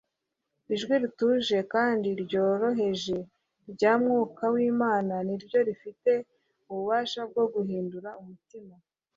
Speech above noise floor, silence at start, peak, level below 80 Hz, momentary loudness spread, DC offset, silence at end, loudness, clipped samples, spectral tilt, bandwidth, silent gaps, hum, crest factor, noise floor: 56 dB; 0.7 s; -10 dBFS; -70 dBFS; 11 LU; under 0.1%; 0.45 s; -27 LUFS; under 0.1%; -6 dB/octave; 7.6 kHz; none; none; 18 dB; -83 dBFS